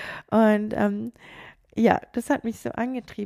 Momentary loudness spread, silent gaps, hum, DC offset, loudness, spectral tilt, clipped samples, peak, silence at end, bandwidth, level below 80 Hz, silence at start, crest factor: 16 LU; none; none; under 0.1%; -24 LUFS; -6.5 dB/octave; under 0.1%; -4 dBFS; 0 s; 14.5 kHz; -56 dBFS; 0 s; 20 dB